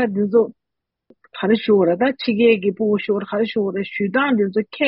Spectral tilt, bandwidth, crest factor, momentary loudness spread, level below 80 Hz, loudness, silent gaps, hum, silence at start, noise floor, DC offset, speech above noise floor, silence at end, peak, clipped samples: -4.5 dB/octave; 5.6 kHz; 14 dB; 8 LU; -64 dBFS; -19 LUFS; none; none; 0 s; -82 dBFS; under 0.1%; 64 dB; 0 s; -4 dBFS; under 0.1%